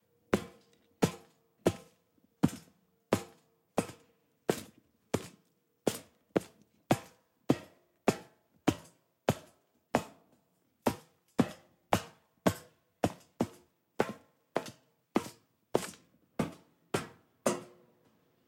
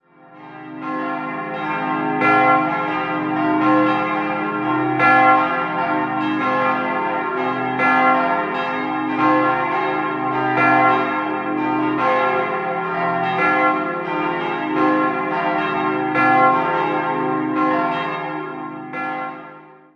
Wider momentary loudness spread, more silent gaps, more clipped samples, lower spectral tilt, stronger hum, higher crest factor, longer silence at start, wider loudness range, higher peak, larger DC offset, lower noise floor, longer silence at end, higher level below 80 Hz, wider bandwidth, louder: first, 15 LU vs 11 LU; neither; neither; second, -5.5 dB/octave vs -7.5 dB/octave; neither; first, 28 dB vs 18 dB; about the same, 0.3 s vs 0.3 s; about the same, 3 LU vs 2 LU; second, -10 dBFS vs -2 dBFS; neither; first, -74 dBFS vs -42 dBFS; first, 0.8 s vs 0.25 s; about the same, -64 dBFS vs -60 dBFS; first, 16.5 kHz vs 6.8 kHz; second, -36 LUFS vs -18 LUFS